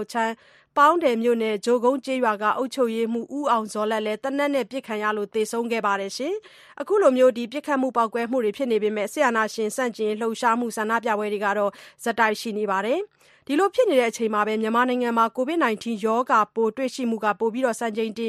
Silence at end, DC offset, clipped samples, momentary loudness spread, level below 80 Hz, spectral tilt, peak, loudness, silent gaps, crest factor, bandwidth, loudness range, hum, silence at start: 0 s; under 0.1%; under 0.1%; 7 LU; -74 dBFS; -4 dB/octave; -6 dBFS; -23 LUFS; none; 18 dB; 14.5 kHz; 3 LU; none; 0 s